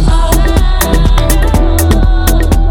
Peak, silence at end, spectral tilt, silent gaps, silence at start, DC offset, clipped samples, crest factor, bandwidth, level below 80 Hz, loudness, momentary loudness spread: 0 dBFS; 0 s; -5.5 dB/octave; none; 0 s; under 0.1%; under 0.1%; 8 dB; 17.5 kHz; -8 dBFS; -11 LUFS; 1 LU